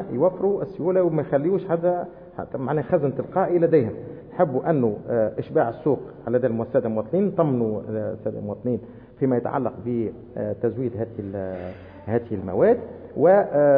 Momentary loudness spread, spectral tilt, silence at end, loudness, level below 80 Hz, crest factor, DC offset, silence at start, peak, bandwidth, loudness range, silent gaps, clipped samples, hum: 11 LU; -13 dB/octave; 0 s; -23 LUFS; -58 dBFS; 16 dB; under 0.1%; 0 s; -6 dBFS; 4.3 kHz; 4 LU; none; under 0.1%; none